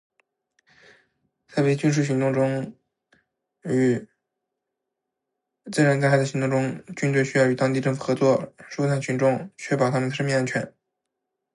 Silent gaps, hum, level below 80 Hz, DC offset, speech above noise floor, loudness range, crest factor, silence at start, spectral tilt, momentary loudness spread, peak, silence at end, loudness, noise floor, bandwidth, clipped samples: none; none; -68 dBFS; under 0.1%; 61 dB; 5 LU; 18 dB; 1.5 s; -6.5 dB/octave; 9 LU; -6 dBFS; 0.85 s; -23 LUFS; -83 dBFS; 11.5 kHz; under 0.1%